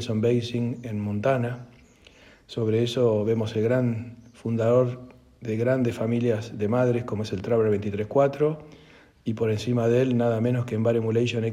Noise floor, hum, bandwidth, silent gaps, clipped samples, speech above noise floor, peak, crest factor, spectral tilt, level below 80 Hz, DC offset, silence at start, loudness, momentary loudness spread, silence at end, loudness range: -53 dBFS; none; 10.5 kHz; none; under 0.1%; 29 dB; -8 dBFS; 16 dB; -7.5 dB/octave; -60 dBFS; under 0.1%; 0 s; -25 LUFS; 10 LU; 0 s; 2 LU